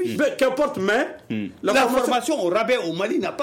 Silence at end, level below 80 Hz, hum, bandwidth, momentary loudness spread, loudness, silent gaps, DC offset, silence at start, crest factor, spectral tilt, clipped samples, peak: 0 s; -58 dBFS; none; 16.5 kHz; 7 LU; -22 LUFS; none; under 0.1%; 0 s; 12 dB; -4 dB/octave; under 0.1%; -10 dBFS